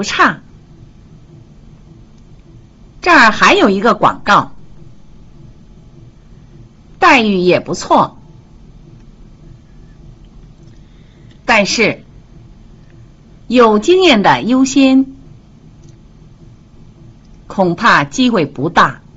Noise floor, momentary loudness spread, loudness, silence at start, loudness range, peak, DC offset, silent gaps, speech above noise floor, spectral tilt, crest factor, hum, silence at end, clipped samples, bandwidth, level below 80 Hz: -40 dBFS; 9 LU; -11 LUFS; 0 s; 6 LU; 0 dBFS; under 0.1%; none; 30 dB; -4.5 dB/octave; 14 dB; none; 0.2 s; under 0.1%; 8 kHz; -42 dBFS